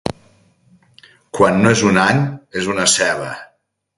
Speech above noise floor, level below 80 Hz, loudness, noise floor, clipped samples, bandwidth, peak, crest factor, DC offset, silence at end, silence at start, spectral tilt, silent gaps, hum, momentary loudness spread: 45 dB; -48 dBFS; -15 LUFS; -60 dBFS; under 0.1%; 11.5 kHz; 0 dBFS; 18 dB; under 0.1%; 0.55 s; 0.05 s; -4 dB/octave; none; none; 16 LU